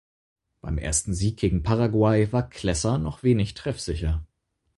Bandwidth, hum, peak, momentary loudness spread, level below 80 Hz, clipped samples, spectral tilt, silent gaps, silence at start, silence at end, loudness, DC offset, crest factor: 11.5 kHz; none; -8 dBFS; 10 LU; -36 dBFS; under 0.1%; -5.5 dB/octave; none; 0.65 s; 0.5 s; -25 LUFS; under 0.1%; 16 dB